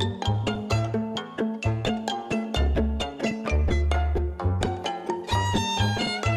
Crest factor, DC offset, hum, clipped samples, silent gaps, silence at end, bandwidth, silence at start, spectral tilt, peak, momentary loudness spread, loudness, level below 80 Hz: 14 dB; under 0.1%; none; under 0.1%; none; 0 s; 12.5 kHz; 0 s; -5.5 dB/octave; -10 dBFS; 5 LU; -27 LUFS; -30 dBFS